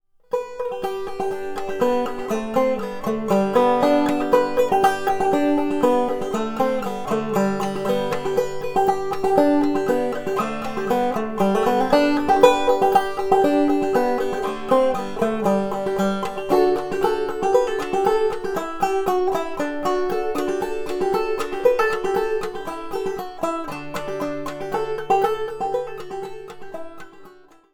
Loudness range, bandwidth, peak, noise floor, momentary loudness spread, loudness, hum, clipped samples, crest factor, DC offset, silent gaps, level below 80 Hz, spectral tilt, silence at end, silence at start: 7 LU; 18.5 kHz; 0 dBFS; -47 dBFS; 10 LU; -21 LUFS; none; under 0.1%; 20 dB; under 0.1%; none; -48 dBFS; -5.5 dB/octave; 0.4 s; 0.3 s